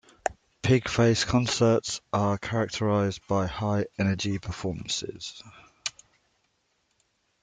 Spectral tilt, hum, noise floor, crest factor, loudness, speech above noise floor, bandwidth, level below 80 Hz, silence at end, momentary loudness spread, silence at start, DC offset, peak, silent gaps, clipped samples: -5 dB/octave; none; -73 dBFS; 20 dB; -27 LUFS; 47 dB; 9.6 kHz; -52 dBFS; 1.5 s; 13 LU; 0.25 s; under 0.1%; -8 dBFS; none; under 0.1%